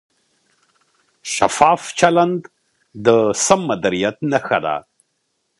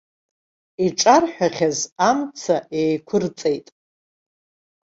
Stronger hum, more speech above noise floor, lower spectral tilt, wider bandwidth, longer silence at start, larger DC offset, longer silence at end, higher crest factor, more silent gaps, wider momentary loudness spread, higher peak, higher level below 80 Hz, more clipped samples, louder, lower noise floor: neither; second, 54 dB vs over 71 dB; about the same, -4 dB/octave vs -4 dB/octave; first, 11.5 kHz vs 8 kHz; first, 1.25 s vs 0.8 s; neither; second, 0.8 s vs 1.25 s; about the same, 18 dB vs 20 dB; second, none vs 1.92-1.96 s; about the same, 10 LU vs 9 LU; about the same, 0 dBFS vs -2 dBFS; first, -56 dBFS vs -64 dBFS; neither; first, -17 LUFS vs -20 LUFS; second, -70 dBFS vs under -90 dBFS